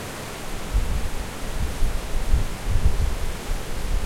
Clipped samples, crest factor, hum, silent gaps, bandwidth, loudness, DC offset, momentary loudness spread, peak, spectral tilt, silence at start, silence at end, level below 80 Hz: under 0.1%; 16 dB; none; none; 16 kHz; -29 LUFS; under 0.1%; 7 LU; -6 dBFS; -5 dB/octave; 0 s; 0 s; -24 dBFS